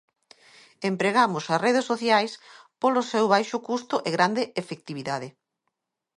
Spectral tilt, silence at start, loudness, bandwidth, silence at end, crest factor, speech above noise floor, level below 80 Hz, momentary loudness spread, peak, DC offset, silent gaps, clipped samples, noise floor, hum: -4.5 dB/octave; 0.8 s; -25 LUFS; 11.5 kHz; 0.9 s; 20 dB; 56 dB; -76 dBFS; 12 LU; -6 dBFS; under 0.1%; none; under 0.1%; -80 dBFS; none